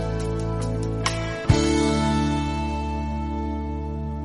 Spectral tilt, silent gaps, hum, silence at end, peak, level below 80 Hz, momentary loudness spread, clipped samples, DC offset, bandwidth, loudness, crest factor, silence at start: -6 dB/octave; none; none; 0 s; -6 dBFS; -30 dBFS; 8 LU; under 0.1%; 0.1%; 11.5 kHz; -25 LUFS; 18 dB; 0 s